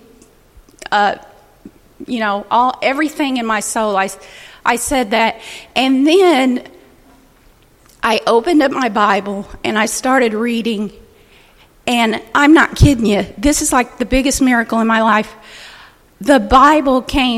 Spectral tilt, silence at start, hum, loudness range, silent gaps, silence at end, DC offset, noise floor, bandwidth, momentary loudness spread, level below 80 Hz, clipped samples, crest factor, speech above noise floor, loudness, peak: -4 dB/octave; 0.8 s; none; 5 LU; none; 0 s; under 0.1%; -49 dBFS; 15.5 kHz; 13 LU; -32 dBFS; under 0.1%; 16 dB; 35 dB; -14 LUFS; 0 dBFS